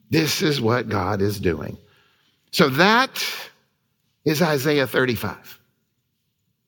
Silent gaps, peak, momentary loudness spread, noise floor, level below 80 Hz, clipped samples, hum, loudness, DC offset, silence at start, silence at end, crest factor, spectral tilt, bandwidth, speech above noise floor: none; -2 dBFS; 15 LU; -72 dBFS; -54 dBFS; under 0.1%; none; -21 LUFS; under 0.1%; 0.1 s; 1.15 s; 22 dB; -4.5 dB/octave; 18 kHz; 52 dB